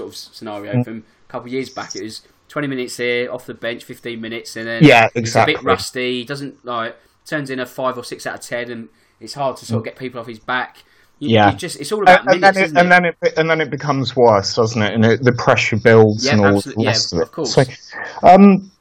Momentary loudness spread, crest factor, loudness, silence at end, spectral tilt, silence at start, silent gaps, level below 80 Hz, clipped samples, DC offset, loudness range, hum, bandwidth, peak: 18 LU; 16 dB; -15 LUFS; 0.15 s; -5.5 dB/octave; 0 s; none; -52 dBFS; under 0.1%; under 0.1%; 11 LU; none; 16.5 kHz; 0 dBFS